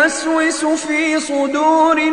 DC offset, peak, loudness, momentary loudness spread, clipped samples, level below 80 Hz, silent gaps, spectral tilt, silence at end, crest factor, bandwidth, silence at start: under 0.1%; -2 dBFS; -15 LUFS; 5 LU; under 0.1%; -54 dBFS; none; -1.5 dB/octave; 0 s; 14 dB; 11 kHz; 0 s